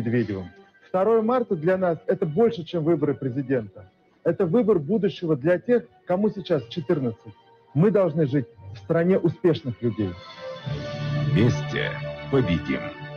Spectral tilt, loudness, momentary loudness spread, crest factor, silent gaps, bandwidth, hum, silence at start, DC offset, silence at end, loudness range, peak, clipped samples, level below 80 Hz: -8.5 dB/octave; -24 LUFS; 11 LU; 14 dB; none; 6.8 kHz; none; 0 s; under 0.1%; 0 s; 2 LU; -8 dBFS; under 0.1%; -52 dBFS